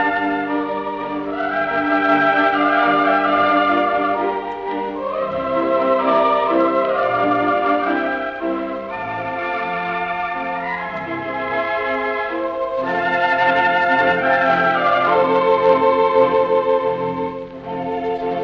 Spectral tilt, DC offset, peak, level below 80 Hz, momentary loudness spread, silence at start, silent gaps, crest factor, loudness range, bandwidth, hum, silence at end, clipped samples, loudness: -2.5 dB/octave; under 0.1%; -2 dBFS; -54 dBFS; 9 LU; 0 s; none; 16 dB; 7 LU; 6.6 kHz; none; 0 s; under 0.1%; -18 LUFS